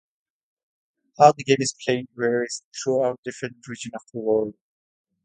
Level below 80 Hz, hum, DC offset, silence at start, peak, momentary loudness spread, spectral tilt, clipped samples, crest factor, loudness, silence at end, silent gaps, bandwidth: -68 dBFS; none; under 0.1%; 1.2 s; 0 dBFS; 17 LU; -4.5 dB/octave; under 0.1%; 24 dB; -23 LUFS; 0.75 s; 2.64-2.72 s, 3.18-3.23 s; 9.4 kHz